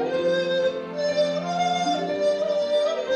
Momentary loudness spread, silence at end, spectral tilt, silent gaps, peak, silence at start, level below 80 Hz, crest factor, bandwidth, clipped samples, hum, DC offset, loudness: 2 LU; 0 s; -4.5 dB/octave; none; -12 dBFS; 0 s; -68 dBFS; 12 dB; 9.6 kHz; under 0.1%; none; under 0.1%; -24 LUFS